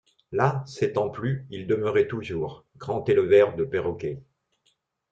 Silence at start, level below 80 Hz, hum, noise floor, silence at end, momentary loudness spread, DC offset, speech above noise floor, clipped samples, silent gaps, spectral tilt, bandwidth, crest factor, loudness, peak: 0.3 s; -60 dBFS; none; -71 dBFS; 0.9 s; 14 LU; under 0.1%; 46 dB; under 0.1%; none; -7.5 dB/octave; 7.8 kHz; 18 dB; -25 LUFS; -6 dBFS